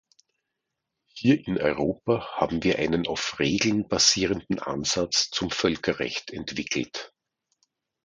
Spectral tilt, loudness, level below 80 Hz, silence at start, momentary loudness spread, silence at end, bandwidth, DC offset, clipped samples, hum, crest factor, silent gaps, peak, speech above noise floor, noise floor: -3.5 dB/octave; -25 LUFS; -52 dBFS; 1.15 s; 10 LU; 1 s; 10.5 kHz; under 0.1%; under 0.1%; none; 22 dB; none; -6 dBFS; 57 dB; -83 dBFS